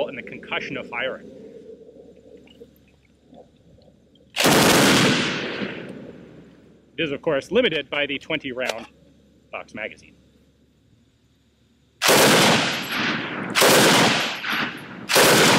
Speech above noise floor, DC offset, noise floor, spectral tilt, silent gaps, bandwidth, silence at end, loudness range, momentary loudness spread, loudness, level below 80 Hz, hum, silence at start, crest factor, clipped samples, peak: 34 dB; under 0.1%; -61 dBFS; -2.5 dB/octave; none; 16.5 kHz; 0 s; 17 LU; 21 LU; -19 LUFS; -56 dBFS; none; 0 s; 18 dB; under 0.1%; -6 dBFS